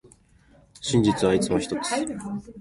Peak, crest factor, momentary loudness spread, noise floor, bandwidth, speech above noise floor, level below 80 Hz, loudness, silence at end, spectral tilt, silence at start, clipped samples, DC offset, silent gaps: -8 dBFS; 18 dB; 13 LU; -56 dBFS; 11.5 kHz; 33 dB; -50 dBFS; -24 LUFS; 0 s; -5 dB/octave; 0.8 s; under 0.1%; under 0.1%; none